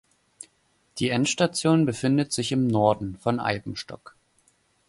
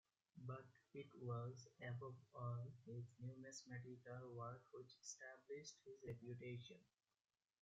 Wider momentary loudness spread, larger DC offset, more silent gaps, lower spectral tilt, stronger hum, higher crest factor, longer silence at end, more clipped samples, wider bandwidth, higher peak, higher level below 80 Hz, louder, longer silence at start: first, 23 LU vs 9 LU; neither; neither; about the same, -5 dB/octave vs -6 dB/octave; neither; about the same, 20 dB vs 18 dB; about the same, 0.9 s vs 0.8 s; neither; first, 11.5 kHz vs 7.6 kHz; first, -6 dBFS vs -38 dBFS; first, -56 dBFS vs -86 dBFS; first, -24 LUFS vs -56 LUFS; first, 0.95 s vs 0.35 s